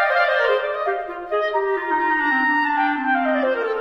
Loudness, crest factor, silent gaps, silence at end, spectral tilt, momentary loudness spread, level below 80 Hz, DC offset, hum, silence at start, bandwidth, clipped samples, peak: -20 LUFS; 14 dB; none; 0 s; -4 dB/octave; 6 LU; -56 dBFS; under 0.1%; none; 0 s; 7.4 kHz; under 0.1%; -6 dBFS